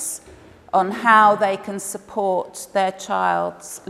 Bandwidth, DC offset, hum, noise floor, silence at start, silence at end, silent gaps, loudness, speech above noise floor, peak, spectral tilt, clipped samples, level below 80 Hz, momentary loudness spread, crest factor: 16 kHz; under 0.1%; none; -45 dBFS; 0 s; 0.1 s; none; -20 LUFS; 26 dB; -2 dBFS; -3.5 dB/octave; under 0.1%; -60 dBFS; 15 LU; 20 dB